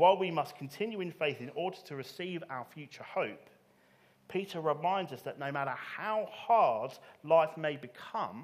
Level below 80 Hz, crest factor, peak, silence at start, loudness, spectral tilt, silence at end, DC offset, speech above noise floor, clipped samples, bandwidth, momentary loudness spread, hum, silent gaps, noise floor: -86 dBFS; 20 dB; -12 dBFS; 0 s; -34 LUFS; -6 dB/octave; 0 s; under 0.1%; 32 dB; under 0.1%; 15.5 kHz; 15 LU; none; none; -66 dBFS